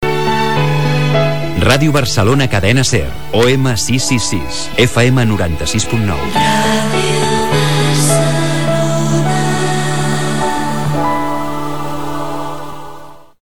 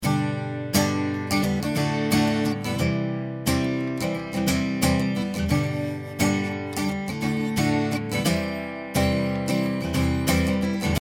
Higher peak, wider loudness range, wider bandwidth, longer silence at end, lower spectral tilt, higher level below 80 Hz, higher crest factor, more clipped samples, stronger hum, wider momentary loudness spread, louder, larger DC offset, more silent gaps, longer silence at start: first, 0 dBFS vs -6 dBFS; first, 4 LU vs 1 LU; about the same, 19 kHz vs 19.5 kHz; about the same, 0.05 s vs 0 s; about the same, -4.5 dB/octave vs -5.5 dB/octave; first, -34 dBFS vs -44 dBFS; about the same, 14 dB vs 18 dB; neither; neither; first, 10 LU vs 5 LU; first, -14 LUFS vs -25 LUFS; first, 9% vs under 0.1%; neither; about the same, 0 s vs 0 s